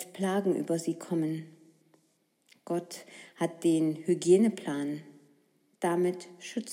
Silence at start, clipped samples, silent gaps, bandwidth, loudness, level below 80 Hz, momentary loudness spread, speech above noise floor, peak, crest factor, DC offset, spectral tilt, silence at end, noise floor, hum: 0 s; under 0.1%; none; 15.5 kHz; -30 LUFS; under -90 dBFS; 16 LU; 43 dB; -12 dBFS; 20 dB; under 0.1%; -6 dB/octave; 0 s; -72 dBFS; none